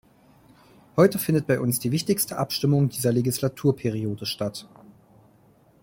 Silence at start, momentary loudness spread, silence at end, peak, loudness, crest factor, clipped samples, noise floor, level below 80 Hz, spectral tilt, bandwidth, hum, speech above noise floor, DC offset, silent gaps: 0.95 s; 9 LU; 1.15 s; -4 dBFS; -24 LUFS; 20 dB; under 0.1%; -58 dBFS; -60 dBFS; -5.5 dB/octave; 17 kHz; none; 34 dB; under 0.1%; none